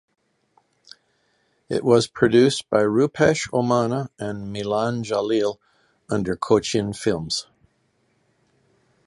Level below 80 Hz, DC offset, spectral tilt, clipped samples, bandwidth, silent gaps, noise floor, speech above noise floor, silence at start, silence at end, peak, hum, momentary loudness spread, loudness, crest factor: -54 dBFS; under 0.1%; -5.5 dB/octave; under 0.1%; 11.5 kHz; none; -67 dBFS; 46 dB; 1.7 s; 1.65 s; -2 dBFS; none; 10 LU; -21 LUFS; 22 dB